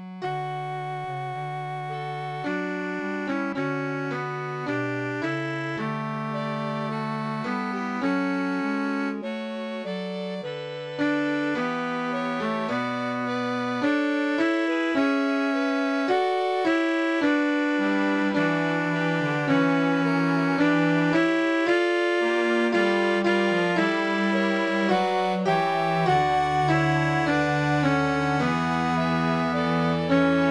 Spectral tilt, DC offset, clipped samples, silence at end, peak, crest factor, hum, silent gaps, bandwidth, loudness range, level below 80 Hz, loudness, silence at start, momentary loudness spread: -6.5 dB/octave; under 0.1%; under 0.1%; 0 s; -8 dBFS; 16 dB; none; none; 11 kHz; 7 LU; -58 dBFS; -25 LUFS; 0 s; 9 LU